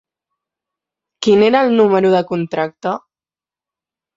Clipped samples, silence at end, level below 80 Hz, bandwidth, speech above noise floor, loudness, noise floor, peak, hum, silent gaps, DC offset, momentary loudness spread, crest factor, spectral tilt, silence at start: under 0.1%; 1.2 s; -60 dBFS; 7.8 kHz; over 76 dB; -15 LUFS; under -90 dBFS; -2 dBFS; none; none; under 0.1%; 12 LU; 16 dB; -6 dB/octave; 1.2 s